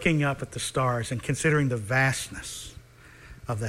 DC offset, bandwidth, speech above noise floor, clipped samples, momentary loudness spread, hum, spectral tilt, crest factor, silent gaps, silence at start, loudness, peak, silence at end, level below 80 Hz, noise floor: under 0.1%; 15.5 kHz; 24 dB; under 0.1%; 14 LU; none; -5 dB/octave; 18 dB; none; 0 s; -27 LUFS; -8 dBFS; 0 s; -50 dBFS; -50 dBFS